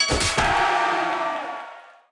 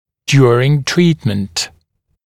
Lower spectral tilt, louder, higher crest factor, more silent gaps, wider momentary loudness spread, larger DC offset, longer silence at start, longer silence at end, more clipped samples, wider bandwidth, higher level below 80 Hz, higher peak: second, -2.5 dB/octave vs -5.5 dB/octave; second, -21 LUFS vs -14 LUFS; about the same, 14 dB vs 14 dB; neither; first, 14 LU vs 10 LU; neither; second, 0 s vs 0.3 s; second, 0.2 s vs 0.6 s; neither; second, 12 kHz vs 14 kHz; first, -40 dBFS vs -48 dBFS; second, -8 dBFS vs 0 dBFS